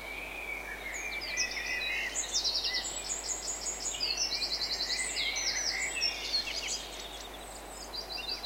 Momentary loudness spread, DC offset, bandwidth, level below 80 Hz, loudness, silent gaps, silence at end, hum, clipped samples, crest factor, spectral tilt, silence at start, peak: 10 LU; under 0.1%; 16 kHz; -54 dBFS; -32 LUFS; none; 0 s; none; under 0.1%; 18 dB; 0.5 dB/octave; 0 s; -18 dBFS